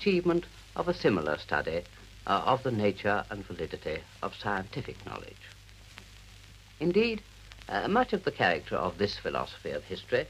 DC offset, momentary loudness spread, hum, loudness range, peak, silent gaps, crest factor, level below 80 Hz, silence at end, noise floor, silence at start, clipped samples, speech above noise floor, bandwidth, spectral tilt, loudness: under 0.1%; 22 LU; none; 8 LU; -10 dBFS; none; 22 dB; -54 dBFS; 0 s; -52 dBFS; 0 s; under 0.1%; 22 dB; 15 kHz; -6 dB/octave; -31 LUFS